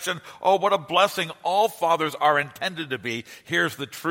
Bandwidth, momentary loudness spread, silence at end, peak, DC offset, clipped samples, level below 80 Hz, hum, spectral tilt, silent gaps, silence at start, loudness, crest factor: 16.5 kHz; 9 LU; 0 s; -4 dBFS; under 0.1%; under 0.1%; -72 dBFS; none; -3.5 dB/octave; none; 0 s; -24 LUFS; 18 dB